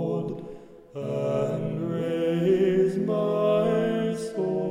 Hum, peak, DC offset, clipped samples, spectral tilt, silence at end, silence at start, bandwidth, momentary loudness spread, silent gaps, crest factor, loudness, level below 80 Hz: none; -12 dBFS; under 0.1%; under 0.1%; -8 dB/octave; 0 s; 0 s; 15 kHz; 12 LU; none; 14 dB; -25 LUFS; -60 dBFS